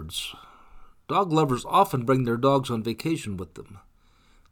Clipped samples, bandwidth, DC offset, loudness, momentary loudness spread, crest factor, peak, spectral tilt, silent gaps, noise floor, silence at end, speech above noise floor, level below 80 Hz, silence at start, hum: under 0.1%; 19 kHz; under 0.1%; -25 LUFS; 15 LU; 20 dB; -6 dBFS; -6 dB/octave; none; -59 dBFS; 0.75 s; 34 dB; -52 dBFS; 0 s; none